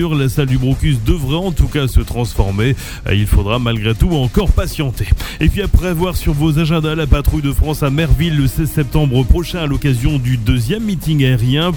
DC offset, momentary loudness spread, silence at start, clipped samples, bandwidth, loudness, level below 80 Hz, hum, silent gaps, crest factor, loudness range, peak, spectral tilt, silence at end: under 0.1%; 4 LU; 0 s; under 0.1%; 19 kHz; -16 LUFS; -20 dBFS; none; none; 14 dB; 1 LU; 0 dBFS; -6.5 dB/octave; 0 s